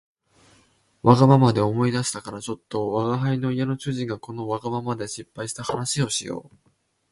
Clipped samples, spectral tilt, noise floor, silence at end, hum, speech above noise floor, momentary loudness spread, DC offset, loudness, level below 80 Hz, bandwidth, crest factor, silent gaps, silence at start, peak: under 0.1%; -6 dB/octave; -61 dBFS; 0.65 s; none; 38 dB; 16 LU; under 0.1%; -23 LUFS; -56 dBFS; 11.5 kHz; 24 dB; none; 1.05 s; 0 dBFS